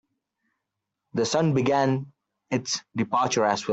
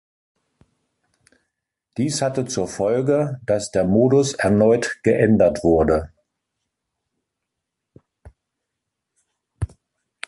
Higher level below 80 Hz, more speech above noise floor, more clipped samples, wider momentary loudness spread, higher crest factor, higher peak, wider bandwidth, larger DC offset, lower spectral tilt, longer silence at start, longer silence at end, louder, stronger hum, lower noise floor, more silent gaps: second, -66 dBFS vs -44 dBFS; second, 59 dB vs 63 dB; neither; second, 8 LU vs 16 LU; about the same, 18 dB vs 18 dB; second, -8 dBFS vs -4 dBFS; second, 8.2 kHz vs 11.5 kHz; neither; about the same, -5 dB/octave vs -6 dB/octave; second, 1.15 s vs 1.95 s; second, 0 s vs 0.6 s; second, -25 LUFS vs -19 LUFS; neither; about the same, -83 dBFS vs -81 dBFS; neither